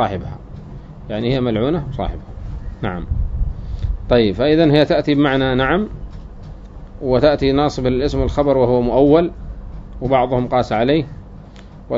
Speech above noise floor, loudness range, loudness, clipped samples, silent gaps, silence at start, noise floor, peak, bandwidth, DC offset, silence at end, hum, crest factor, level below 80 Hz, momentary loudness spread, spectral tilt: 22 dB; 6 LU; -17 LUFS; under 0.1%; none; 0 s; -37 dBFS; 0 dBFS; 7.6 kHz; under 0.1%; 0 s; none; 18 dB; -28 dBFS; 21 LU; -7.5 dB/octave